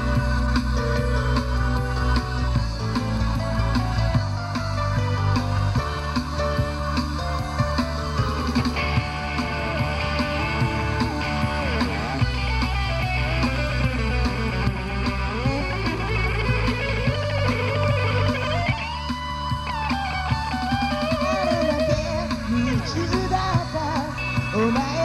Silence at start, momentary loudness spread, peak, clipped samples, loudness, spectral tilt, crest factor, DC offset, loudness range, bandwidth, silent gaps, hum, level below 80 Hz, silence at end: 0 s; 4 LU; -8 dBFS; under 0.1%; -24 LUFS; -6 dB/octave; 14 dB; under 0.1%; 1 LU; 13 kHz; none; none; -30 dBFS; 0 s